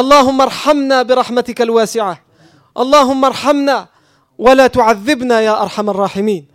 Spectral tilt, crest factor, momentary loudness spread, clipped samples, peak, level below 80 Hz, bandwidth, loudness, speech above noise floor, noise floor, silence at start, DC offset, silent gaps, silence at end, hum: -4 dB/octave; 12 dB; 9 LU; under 0.1%; 0 dBFS; -46 dBFS; 16 kHz; -12 LUFS; 37 dB; -48 dBFS; 0 s; under 0.1%; none; 0.15 s; none